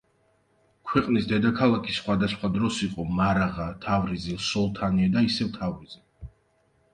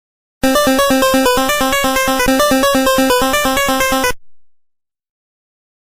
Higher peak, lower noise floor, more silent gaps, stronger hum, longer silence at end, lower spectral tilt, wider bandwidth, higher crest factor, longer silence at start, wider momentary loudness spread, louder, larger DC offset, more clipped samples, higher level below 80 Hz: second, -6 dBFS vs -2 dBFS; first, -67 dBFS vs -63 dBFS; neither; neither; second, 0.65 s vs 1.5 s; first, -6 dB/octave vs -2.5 dB/octave; second, 10 kHz vs 16 kHz; first, 20 dB vs 14 dB; first, 0.85 s vs 0.45 s; first, 9 LU vs 3 LU; second, -25 LUFS vs -13 LUFS; neither; neither; second, -48 dBFS vs -34 dBFS